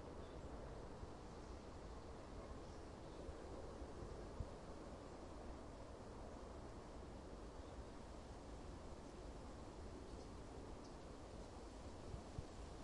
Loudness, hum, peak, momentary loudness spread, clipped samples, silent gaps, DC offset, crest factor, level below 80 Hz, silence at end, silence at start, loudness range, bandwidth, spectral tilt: -56 LUFS; none; -34 dBFS; 2 LU; under 0.1%; none; under 0.1%; 18 dB; -58 dBFS; 0 s; 0 s; 1 LU; 11 kHz; -6 dB/octave